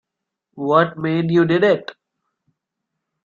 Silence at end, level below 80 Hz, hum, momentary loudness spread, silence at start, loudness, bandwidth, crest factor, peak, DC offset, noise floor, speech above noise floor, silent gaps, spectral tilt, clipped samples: 1.3 s; -62 dBFS; none; 10 LU; 0.55 s; -18 LUFS; 7 kHz; 18 dB; -2 dBFS; under 0.1%; -82 dBFS; 65 dB; none; -8 dB/octave; under 0.1%